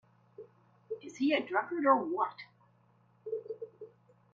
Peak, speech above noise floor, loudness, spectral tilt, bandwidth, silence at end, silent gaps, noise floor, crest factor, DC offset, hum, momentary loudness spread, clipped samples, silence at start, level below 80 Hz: -12 dBFS; 37 dB; -32 LUFS; -5 dB/octave; 7.6 kHz; 0.5 s; none; -67 dBFS; 24 dB; under 0.1%; none; 26 LU; under 0.1%; 0.4 s; -84 dBFS